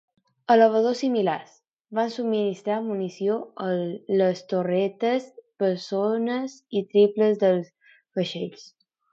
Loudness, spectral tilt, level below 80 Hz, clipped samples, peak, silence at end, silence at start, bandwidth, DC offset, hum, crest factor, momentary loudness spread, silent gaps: -24 LUFS; -6.5 dB/octave; -78 dBFS; under 0.1%; -6 dBFS; 0.5 s; 0.5 s; 7.8 kHz; under 0.1%; none; 20 dB; 11 LU; 1.73-1.79 s